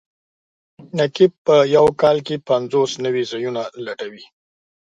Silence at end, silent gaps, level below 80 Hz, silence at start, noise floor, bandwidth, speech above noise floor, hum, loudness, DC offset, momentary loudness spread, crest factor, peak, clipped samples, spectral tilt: 0.7 s; 1.38-1.45 s; -58 dBFS; 0.8 s; under -90 dBFS; 9.2 kHz; over 73 dB; none; -18 LUFS; under 0.1%; 15 LU; 18 dB; -2 dBFS; under 0.1%; -5.5 dB/octave